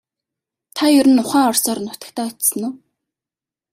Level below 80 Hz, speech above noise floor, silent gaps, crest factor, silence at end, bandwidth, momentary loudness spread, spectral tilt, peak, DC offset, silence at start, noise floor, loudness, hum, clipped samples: -64 dBFS; 73 dB; none; 16 dB; 0.95 s; 16 kHz; 15 LU; -2.5 dB/octave; -2 dBFS; under 0.1%; 0.75 s; -89 dBFS; -16 LUFS; none; under 0.1%